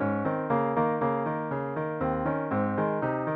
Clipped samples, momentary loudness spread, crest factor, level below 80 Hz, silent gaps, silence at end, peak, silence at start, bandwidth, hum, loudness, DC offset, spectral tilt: under 0.1%; 5 LU; 14 dB; -56 dBFS; none; 0 s; -14 dBFS; 0 s; 4.6 kHz; none; -28 LUFS; under 0.1%; -11 dB/octave